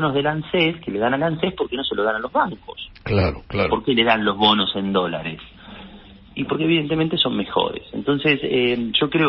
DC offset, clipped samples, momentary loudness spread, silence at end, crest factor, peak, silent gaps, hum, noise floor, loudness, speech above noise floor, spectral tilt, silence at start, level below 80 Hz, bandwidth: under 0.1%; under 0.1%; 15 LU; 0 s; 20 dB; -2 dBFS; none; none; -43 dBFS; -20 LUFS; 23 dB; -10.5 dB/octave; 0 s; -44 dBFS; 5.8 kHz